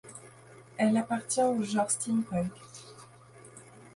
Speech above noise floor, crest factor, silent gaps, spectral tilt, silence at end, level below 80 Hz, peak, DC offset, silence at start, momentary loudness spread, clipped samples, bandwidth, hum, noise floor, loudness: 25 dB; 16 dB; none; -4.5 dB/octave; 0.05 s; -66 dBFS; -16 dBFS; under 0.1%; 0.05 s; 23 LU; under 0.1%; 11.5 kHz; none; -53 dBFS; -29 LUFS